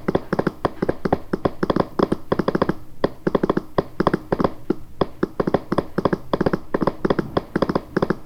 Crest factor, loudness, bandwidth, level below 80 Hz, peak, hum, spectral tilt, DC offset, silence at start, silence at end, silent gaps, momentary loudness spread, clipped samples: 20 dB; -23 LUFS; 16 kHz; -40 dBFS; -2 dBFS; none; -8 dB/octave; under 0.1%; 0 s; 0 s; none; 4 LU; under 0.1%